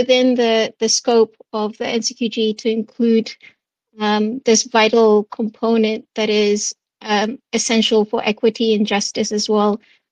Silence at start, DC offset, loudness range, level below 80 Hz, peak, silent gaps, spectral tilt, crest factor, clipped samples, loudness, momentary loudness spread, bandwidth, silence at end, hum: 0 s; under 0.1%; 3 LU; -64 dBFS; -2 dBFS; none; -3.5 dB/octave; 16 dB; under 0.1%; -17 LUFS; 8 LU; 9.6 kHz; 0.35 s; none